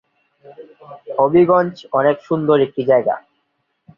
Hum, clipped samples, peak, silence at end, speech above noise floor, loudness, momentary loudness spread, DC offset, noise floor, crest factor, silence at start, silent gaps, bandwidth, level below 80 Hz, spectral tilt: none; under 0.1%; -2 dBFS; 0.8 s; 53 dB; -16 LUFS; 9 LU; under 0.1%; -69 dBFS; 16 dB; 0.5 s; none; 6.6 kHz; -60 dBFS; -9 dB/octave